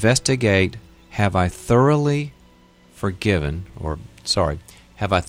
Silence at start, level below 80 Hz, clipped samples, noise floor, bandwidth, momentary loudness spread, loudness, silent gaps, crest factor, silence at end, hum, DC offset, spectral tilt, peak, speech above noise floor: 0 s; -38 dBFS; under 0.1%; -51 dBFS; 15.5 kHz; 13 LU; -21 LUFS; none; 18 dB; 0 s; none; under 0.1%; -5 dB/octave; -4 dBFS; 32 dB